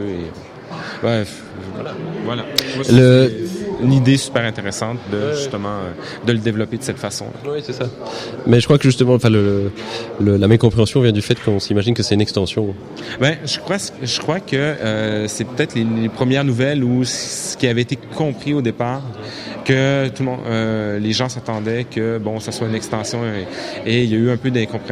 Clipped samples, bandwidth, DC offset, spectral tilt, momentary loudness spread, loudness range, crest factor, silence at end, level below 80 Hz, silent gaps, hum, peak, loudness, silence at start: under 0.1%; 15.5 kHz; under 0.1%; -5.5 dB/octave; 13 LU; 5 LU; 18 dB; 0 s; -48 dBFS; none; none; 0 dBFS; -18 LUFS; 0 s